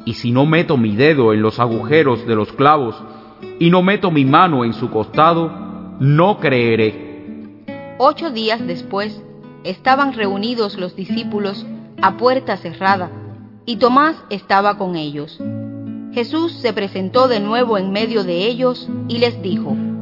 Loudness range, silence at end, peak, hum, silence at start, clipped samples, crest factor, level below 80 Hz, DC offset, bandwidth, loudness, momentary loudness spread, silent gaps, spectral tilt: 5 LU; 0 s; 0 dBFS; none; 0 s; under 0.1%; 16 dB; -58 dBFS; under 0.1%; 5.8 kHz; -16 LUFS; 17 LU; none; -8 dB/octave